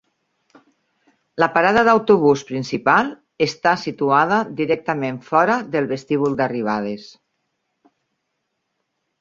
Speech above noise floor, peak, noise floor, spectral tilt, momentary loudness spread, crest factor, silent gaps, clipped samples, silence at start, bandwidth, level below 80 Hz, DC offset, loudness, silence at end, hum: 57 dB; -2 dBFS; -75 dBFS; -6 dB/octave; 10 LU; 18 dB; none; under 0.1%; 1.35 s; 7.6 kHz; -60 dBFS; under 0.1%; -18 LUFS; 2.15 s; none